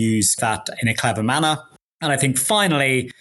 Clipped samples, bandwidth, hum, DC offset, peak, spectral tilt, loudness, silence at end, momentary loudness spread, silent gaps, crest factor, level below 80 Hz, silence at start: under 0.1%; 12 kHz; none; under 0.1%; -2 dBFS; -3.5 dB/octave; -19 LUFS; 0.1 s; 6 LU; 1.82-1.99 s; 18 dB; -56 dBFS; 0 s